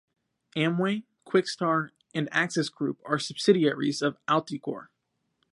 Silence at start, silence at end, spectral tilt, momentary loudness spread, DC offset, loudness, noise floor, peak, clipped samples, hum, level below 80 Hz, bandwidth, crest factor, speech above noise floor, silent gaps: 0.55 s; 0.7 s; -5 dB/octave; 11 LU; under 0.1%; -27 LUFS; -76 dBFS; -8 dBFS; under 0.1%; none; -76 dBFS; 11.5 kHz; 20 dB; 49 dB; none